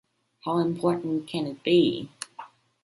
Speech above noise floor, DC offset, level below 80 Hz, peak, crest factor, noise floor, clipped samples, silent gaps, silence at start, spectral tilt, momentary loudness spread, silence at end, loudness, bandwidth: 22 dB; under 0.1%; -68 dBFS; -10 dBFS; 16 dB; -47 dBFS; under 0.1%; none; 0.45 s; -6 dB/octave; 17 LU; 0.4 s; -26 LUFS; 11.5 kHz